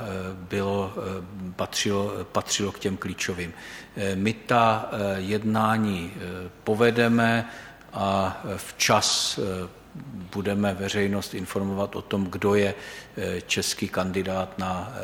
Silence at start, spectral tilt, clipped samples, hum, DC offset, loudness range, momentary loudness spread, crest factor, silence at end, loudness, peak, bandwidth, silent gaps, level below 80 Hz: 0 s; -4 dB/octave; under 0.1%; none; under 0.1%; 5 LU; 14 LU; 20 dB; 0 s; -26 LUFS; -6 dBFS; 17.5 kHz; none; -56 dBFS